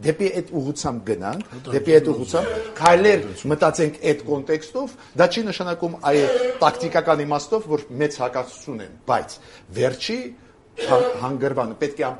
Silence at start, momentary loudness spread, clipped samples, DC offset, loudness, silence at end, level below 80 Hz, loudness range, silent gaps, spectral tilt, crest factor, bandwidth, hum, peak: 0 s; 14 LU; under 0.1%; under 0.1%; -21 LUFS; 0 s; -54 dBFS; 6 LU; none; -5 dB/octave; 22 dB; 11.5 kHz; none; 0 dBFS